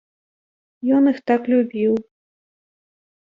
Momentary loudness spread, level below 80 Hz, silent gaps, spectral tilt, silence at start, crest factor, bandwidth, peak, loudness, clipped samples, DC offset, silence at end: 7 LU; -68 dBFS; none; -8.5 dB/octave; 0.85 s; 18 dB; 5.4 kHz; -4 dBFS; -19 LUFS; under 0.1%; under 0.1%; 1.3 s